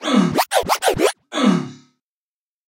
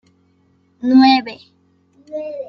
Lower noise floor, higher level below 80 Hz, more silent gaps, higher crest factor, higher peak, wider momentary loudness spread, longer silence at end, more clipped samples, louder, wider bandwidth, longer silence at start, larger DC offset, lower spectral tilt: first, under -90 dBFS vs -58 dBFS; first, -48 dBFS vs -62 dBFS; neither; about the same, 14 dB vs 16 dB; about the same, -4 dBFS vs -2 dBFS; second, 5 LU vs 20 LU; first, 0.95 s vs 0.05 s; neither; second, -18 LUFS vs -14 LUFS; first, 16.5 kHz vs 6 kHz; second, 0 s vs 0.8 s; neither; about the same, -4.5 dB/octave vs -5 dB/octave